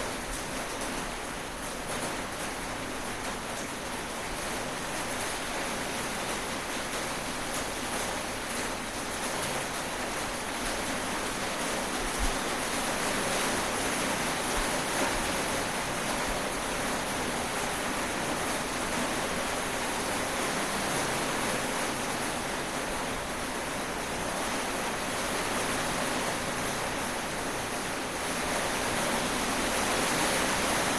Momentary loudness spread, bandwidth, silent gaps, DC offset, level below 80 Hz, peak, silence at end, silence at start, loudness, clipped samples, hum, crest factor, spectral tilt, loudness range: 6 LU; 15.5 kHz; none; 0.2%; -46 dBFS; -16 dBFS; 0 s; 0 s; -31 LUFS; under 0.1%; none; 16 dB; -2.5 dB/octave; 4 LU